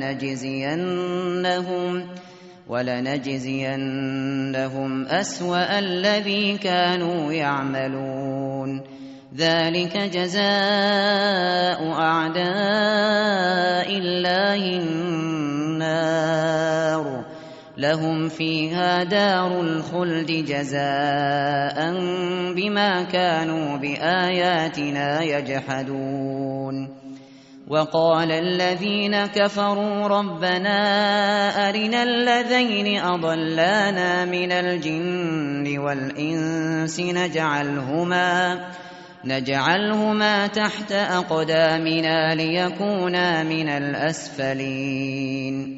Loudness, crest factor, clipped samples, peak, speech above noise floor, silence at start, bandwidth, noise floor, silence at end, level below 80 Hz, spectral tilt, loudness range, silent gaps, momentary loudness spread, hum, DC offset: -22 LUFS; 18 dB; under 0.1%; -4 dBFS; 23 dB; 0 s; 8 kHz; -45 dBFS; 0 s; -64 dBFS; -3 dB/octave; 4 LU; none; 8 LU; none; under 0.1%